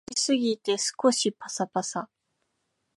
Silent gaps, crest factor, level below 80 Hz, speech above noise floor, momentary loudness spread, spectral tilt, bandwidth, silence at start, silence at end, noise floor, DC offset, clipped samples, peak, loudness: none; 20 dB; -76 dBFS; 51 dB; 10 LU; -3 dB/octave; 11.5 kHz; 0.1 s; 0.9 s; -77 dBFS; under 0.1%; under 0.1%; -8 dBFS; -27 LUFS